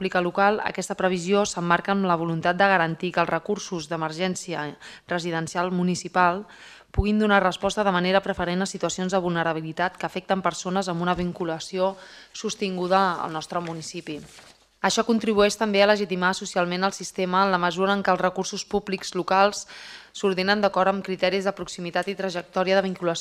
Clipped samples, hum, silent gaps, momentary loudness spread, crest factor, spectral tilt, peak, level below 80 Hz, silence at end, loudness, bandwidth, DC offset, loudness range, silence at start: under 0.1%; none; none; 10 LU; 20 dB; -4.5 dB/octave; -4 dBFS; -46 dBFS; 0 s; -24 LUFS; 13.5 kHz; under 0.1%; 4 LU; 0 s